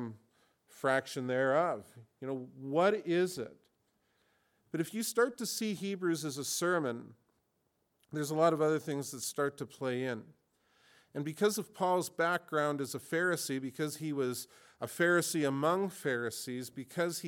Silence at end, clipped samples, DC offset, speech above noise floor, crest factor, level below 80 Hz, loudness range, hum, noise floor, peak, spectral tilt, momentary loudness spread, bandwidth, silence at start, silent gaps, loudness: 0 s; under 0.1%; under 0.1%; 45 dB; 20 dB; -84 dBFS; 3 LU; none; -79 dBFS; -14 dBFS; -4.5 dB/octave; 12 LU; 19 kHz; 0 s; none; -34 LUFS